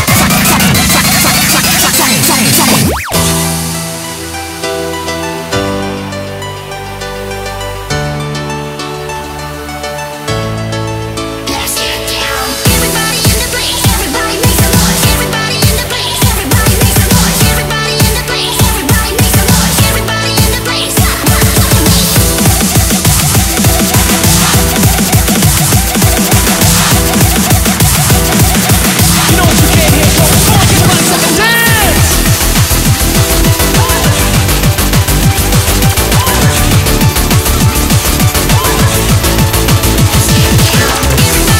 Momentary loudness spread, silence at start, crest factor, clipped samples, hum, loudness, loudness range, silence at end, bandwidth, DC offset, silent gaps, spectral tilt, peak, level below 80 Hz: 11 LU; 0 s; 8 dB; 0.6%; none; -8 LUFS; 10 LU; 0 s; over 20 kHz; under 0.1%; none; -3.5 dB/octave; 0 dBFS; -18 dBFS